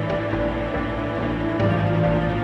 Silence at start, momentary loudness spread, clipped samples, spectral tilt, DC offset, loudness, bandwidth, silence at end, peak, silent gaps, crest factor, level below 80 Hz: 0 s; 5 LU; under 0.1%; -8.5 dB/octave; under 0.1%; -23 LUFS; 6.4 kHz; 0 s; -8 dBFS; none; 14 dB; -36 dBFS